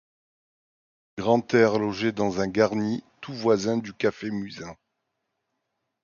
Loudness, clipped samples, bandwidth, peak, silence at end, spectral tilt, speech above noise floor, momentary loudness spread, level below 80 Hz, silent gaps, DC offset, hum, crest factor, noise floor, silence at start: -25 LUFS; under 0.1%; 7.2 kHz; -6 dBFS; 1.3 s; -6 dB/octave; 55 dB; 16 LU; -60 dBFS; none; under 0.1%; none; 20 dB; -79 dBFS; 1.15 s